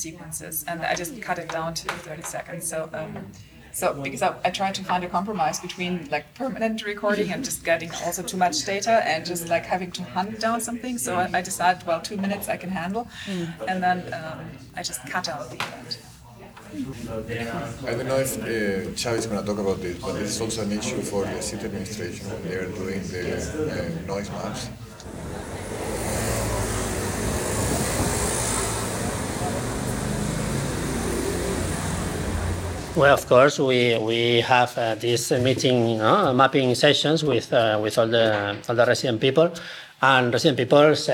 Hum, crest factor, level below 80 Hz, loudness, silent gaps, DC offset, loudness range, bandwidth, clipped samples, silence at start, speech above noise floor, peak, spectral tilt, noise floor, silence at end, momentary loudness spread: none; 20 dB; -44 dBFS; -24 LUFS; none; under 0.1%; 10 LU; over 20 kHz; under 0.1%; 0 s; 21 dB; -4 dBFS; -4 dB/octave; -44 dBFS; 0 s; 14 LU